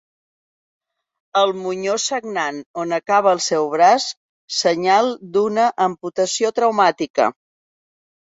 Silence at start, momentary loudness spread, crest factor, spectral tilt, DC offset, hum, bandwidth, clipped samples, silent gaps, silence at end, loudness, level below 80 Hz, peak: 1.35 s; 9 LU; 18 dB; -3 dB/octave; under 0.1%; none; 8 kHz; under 0.1%; 2.66-2.74 s, 4.17-4.48 s, 7.10-7.14 s; 1 s; -18 LUFS; -68 dBFS; -2 dBFS